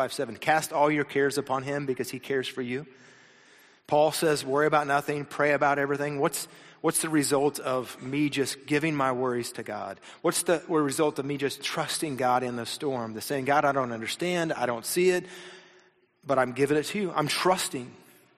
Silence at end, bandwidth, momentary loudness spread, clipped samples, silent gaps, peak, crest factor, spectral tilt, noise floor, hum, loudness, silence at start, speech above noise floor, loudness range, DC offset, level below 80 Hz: 0.4 s; 15 kHz; 9 LU; under 0.1%; none; -10 dBFS; 18 dB; -4 dB/octave; -61 dBFS; none; -27 LUFS; 0 s; 34 dB; 3 LU; under 0.1%; -68 dBFS